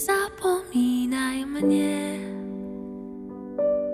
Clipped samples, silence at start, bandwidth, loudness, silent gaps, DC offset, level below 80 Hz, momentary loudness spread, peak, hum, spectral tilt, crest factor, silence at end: under 0.1%; 0 s; 16 kHz; -26 LUFS; none; under 0.1%; -56 dBFS; 14 LU; -12 dBFS; none; -4.5 dB/octave; 14 dB; 0 s